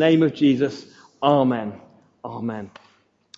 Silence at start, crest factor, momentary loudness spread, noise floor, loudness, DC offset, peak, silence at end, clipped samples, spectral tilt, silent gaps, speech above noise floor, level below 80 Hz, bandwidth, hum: 0 s; 18 dB; 21 LU; -53 dBFS; -21 LUFS; under 0.1%; -4 dBFS; 0.7 s; under 0.1%; -7.5 dB/octave; none; 33 dB; -70 dBFS; 7.6 kHz; none